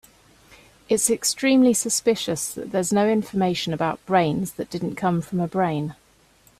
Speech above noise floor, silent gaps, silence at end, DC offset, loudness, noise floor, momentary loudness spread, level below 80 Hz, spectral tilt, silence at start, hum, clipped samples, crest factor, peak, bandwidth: 35 dB; none; 0.65 s; under 0.1%; -22 LUFS; -57 dBFS; 9 LU; -58 dBFS; -4.5 dB/octave; 0.9 s; none; under 0.1%; 18 dB; -4 dBFS; 16 kHz